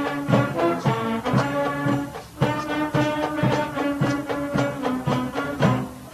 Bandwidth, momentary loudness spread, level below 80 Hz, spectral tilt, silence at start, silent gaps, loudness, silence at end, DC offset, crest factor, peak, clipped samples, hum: 14 kHz; 4 LU; -50 dBFS; -6.5 dB/octave; 0 s; none; -23 LUFS; 0 s; under 0.1%; 18 dB; -6 dBFS; under 0.1%; none